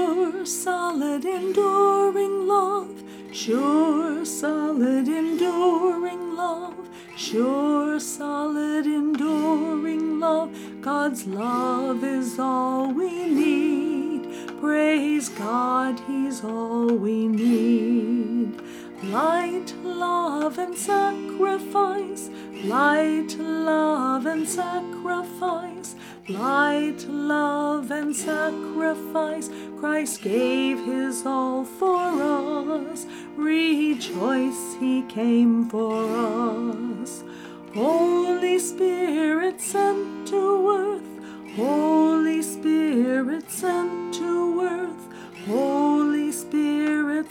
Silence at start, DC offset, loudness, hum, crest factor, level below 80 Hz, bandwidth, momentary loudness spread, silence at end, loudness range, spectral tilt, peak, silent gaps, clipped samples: 0 s; under 0.1%; -24 LUFS; none; 16 dB; -70 dBFS; 17.5 kHz; 10 LU; 0 s; 3 LU; -4.5 dB/octave; -6 dBFS; none; under 0.1%